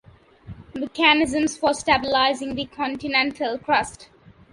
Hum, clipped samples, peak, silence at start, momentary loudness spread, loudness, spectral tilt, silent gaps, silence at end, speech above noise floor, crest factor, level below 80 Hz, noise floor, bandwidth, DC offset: none; under 0.1%; -2 dBFS; 0.45 s; 13 LU; -21 LUFS; -3 dB/octave; none; 0.5 s; 22 dB; 20 dB; -52 dBFS; -44 dBFS; 11.5 kHz; under 0.1%